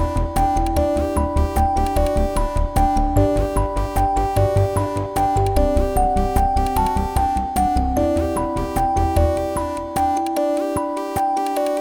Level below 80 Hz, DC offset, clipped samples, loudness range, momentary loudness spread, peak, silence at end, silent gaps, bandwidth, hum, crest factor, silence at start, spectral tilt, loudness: -24 dBFS; under 0.1%; under 0.1%; 1 LU; 4 LU; -4 dBFS; 0 s; none; 19.5 kHz; none; 16 dB; 0 s; -6.5 dB/octave; -20 LUFS